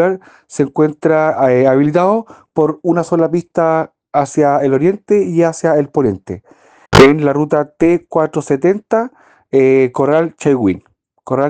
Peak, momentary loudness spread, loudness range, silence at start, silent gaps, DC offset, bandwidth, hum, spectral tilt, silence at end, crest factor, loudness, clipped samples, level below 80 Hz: 0 dBFS; 8 LU; 2 LU; 0 s; none; under 0.1%; 10 kHz; none; -6.5 dB/octave; 0 s; 14 dB; -13 LUFS; 0.3%; -42 dBFS